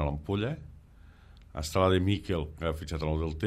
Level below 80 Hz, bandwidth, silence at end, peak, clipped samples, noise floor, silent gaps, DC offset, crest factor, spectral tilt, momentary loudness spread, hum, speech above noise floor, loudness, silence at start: -44 dBFS; 15 kHz; 0 s; -12 dBFS; under 0.1%; -54 dBFS; none; under 0.1%; 20 dB; -6.5 dB/octave; 12 LU; none; 24 dB; -31 LUFS; 0 s